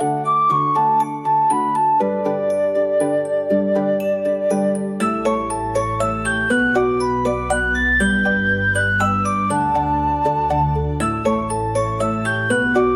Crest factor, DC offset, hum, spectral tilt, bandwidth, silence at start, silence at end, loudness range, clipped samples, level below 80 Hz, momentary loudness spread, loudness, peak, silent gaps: 12 dB; under 0.1%; none; -6 dB/octave; 14 kHz; 0 s; 0 s; 2 LU; under 0.1%; -36 dBFS; 4 LU; -19 LUFS; -6 dBFS; none